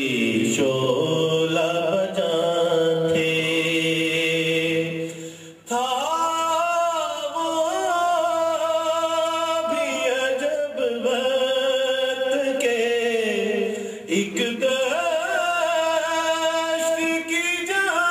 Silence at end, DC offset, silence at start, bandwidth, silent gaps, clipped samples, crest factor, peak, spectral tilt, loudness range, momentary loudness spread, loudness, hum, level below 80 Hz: 0 s; under 0.1%; 0 s; 15.5 kHz; none; under 0.1%; 14 dB; -8 dBFS; -3.5 dB/octave; 2 LU; 4 LU; -22 LUFS; none; -68 dBFS